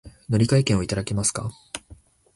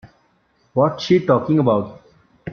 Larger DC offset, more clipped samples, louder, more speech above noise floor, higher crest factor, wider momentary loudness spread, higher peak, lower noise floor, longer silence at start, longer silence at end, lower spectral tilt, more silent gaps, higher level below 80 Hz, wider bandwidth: neither; neither; second, -23 LUFS vs -18 LUFS; second, 28 dB vs 45 dB; about the same, 18 dB vs 18 dB; first, 18 LU vs 14 LU; second, -6 dBFS vs -2 dBFS; second, -50 dBFS vs -61 dBFS; about the same, 0.05 s vs 0.05 s; first, 0.4 s vs 0 s; second, -5 dB/octave vs -7.5 dB/octave; neither; first, -44 dBFS vs -56 dBFS; first, 11.5 kHz vs 6.8 kHz